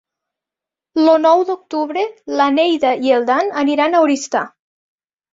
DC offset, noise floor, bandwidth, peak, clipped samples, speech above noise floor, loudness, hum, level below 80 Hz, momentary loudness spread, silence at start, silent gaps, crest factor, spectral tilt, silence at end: under 0.1%; -87 dBFS; 7.8 kHz; -2 dBFS; under 0.1%; 72 dB; -15 LUFS; none; -66 dBFS; 9 LU; 0.95 s; none; 14 dB; -3 dB/octave; 0.85 s